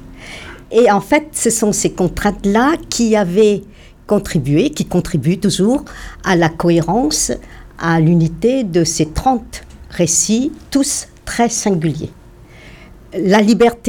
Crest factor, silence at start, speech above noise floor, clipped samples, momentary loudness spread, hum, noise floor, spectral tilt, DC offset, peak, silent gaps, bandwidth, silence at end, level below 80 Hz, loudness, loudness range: 16 dB; 0 s; 25 dB; under 0.1%; 12 LU; none; -40 dBFS; -4.5 dB/octave; under 0.1%; 0 dBFS; none; 18.5 kHz; 0 s; -36 dBFS; -15 LUFS; 2 LU